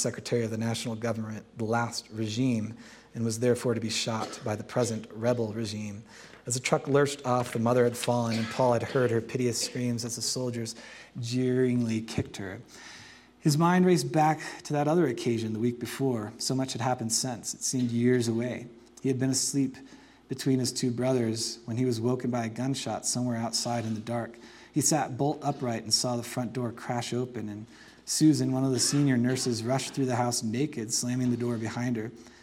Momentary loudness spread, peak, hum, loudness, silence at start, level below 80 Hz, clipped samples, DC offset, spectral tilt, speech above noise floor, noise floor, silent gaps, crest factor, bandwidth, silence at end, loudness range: 12 LU; -8 dBFS; none; -29 LUFS; 0 s; -68 dBFS; under 0.1%; under 0.1%; -4.5 dB/octave; 23 dB; -51 dBFS; none; 22 dB; 16.5 kHz; 0.15 s; 4 LU